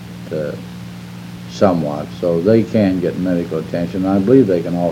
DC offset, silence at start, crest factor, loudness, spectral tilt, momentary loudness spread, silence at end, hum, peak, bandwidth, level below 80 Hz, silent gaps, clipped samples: under 0.1%; 0 s; 16 dB; -16 LUFS; -8 dB/octave; 19 LU; 0 s; none; 0 dBFS; 16 kHz; -48 dBFS; none; under 0.1%